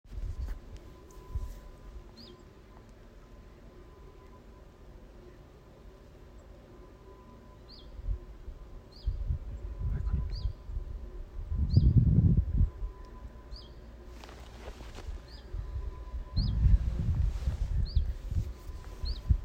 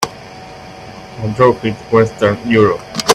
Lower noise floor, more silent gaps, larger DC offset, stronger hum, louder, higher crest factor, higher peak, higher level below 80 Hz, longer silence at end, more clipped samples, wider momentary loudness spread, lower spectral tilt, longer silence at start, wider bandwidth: first, -53 dBFS vs -33 dBFS; neither; neither; neither; second, -33 LUFS vs -14 LUFS; first, 22 dB vs 16 dB; second, -10 dBFS vs 0 dBFS; first, -36 dBFS vs -44 dBFS; about the same, 0 s vs 0 s; neither; first, 26 LU vs 21 LU; first, -8.5 dB/octave vs -5 dB/octave; about the same, 0.05 s vs 0 s; second, 8 kHz vs 15 kHz